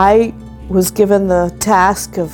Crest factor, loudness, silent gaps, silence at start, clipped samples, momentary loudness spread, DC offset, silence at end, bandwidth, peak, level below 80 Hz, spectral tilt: 12 dB; -13 LUFS; none; 0 s; under 0.1%; 8 LU; under 0.1%; 0 s; 18 kHz; 0 dBFS; -34 dBFS; -5 dB/octave